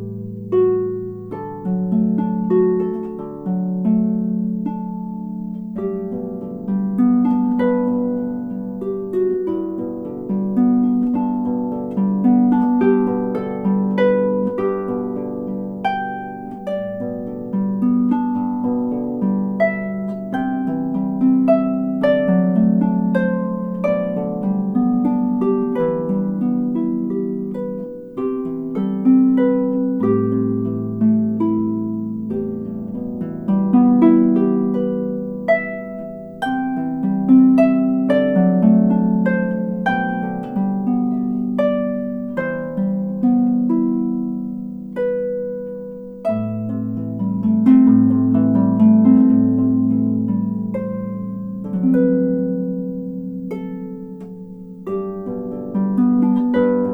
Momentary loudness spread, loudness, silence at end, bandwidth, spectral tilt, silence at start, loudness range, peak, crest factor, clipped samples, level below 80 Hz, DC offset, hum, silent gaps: 13 LU; -19 LUFS; 0 s; 3.7 kHz; -10.5 dB/octave; 0 s; 7 LU; 0 dBFS; 18 dB; under 0.1%; -56 dBFS; under 0.1%; none; none